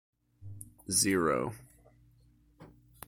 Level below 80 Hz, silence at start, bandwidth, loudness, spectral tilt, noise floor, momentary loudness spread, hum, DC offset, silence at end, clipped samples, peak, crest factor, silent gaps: -62 dBFS; 0.4 s; 17 kHz; -29 LUFS; -3 dB/octave; -64 dBFS; 23 LU; 60 Hz at -60 dBFS; under 0.1%; 0.4 s; under 0.1%; -14 dBFS; 22 dB; none